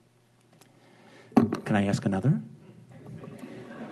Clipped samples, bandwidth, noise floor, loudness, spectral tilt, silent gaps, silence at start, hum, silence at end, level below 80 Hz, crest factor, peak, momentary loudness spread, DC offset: under 0.1%; 12.5 kHz; -63 dBFS; -27 LUFS; -7.5 dB/octave; none; 1.35 s; none; 0 s; -64 dBFS; 22 dB; -8 dBFS; 21 LU; under 0.1%